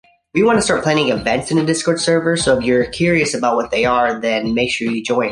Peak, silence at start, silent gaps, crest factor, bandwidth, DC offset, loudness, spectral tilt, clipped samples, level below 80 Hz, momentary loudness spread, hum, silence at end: 0 dBFS; 0.35 s; none; 16 dB; 11.5 kHz; under 0.1%; -16 LUFS; -4.5 dB/octave; under 0.1%; -44 dBFS; 4 LU; none; 0 s